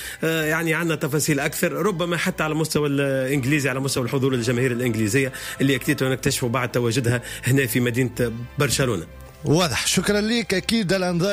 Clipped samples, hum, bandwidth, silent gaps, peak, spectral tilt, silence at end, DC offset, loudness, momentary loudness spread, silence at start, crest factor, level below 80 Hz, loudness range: under 0.1%; none; 16 kHz; none; -8 dBFS; -4.5 dB/octave; 0 s; under 0.1%; -22 LUFS; 4 LU; 0 s; 14 dB; -46 dBFS; 0 LU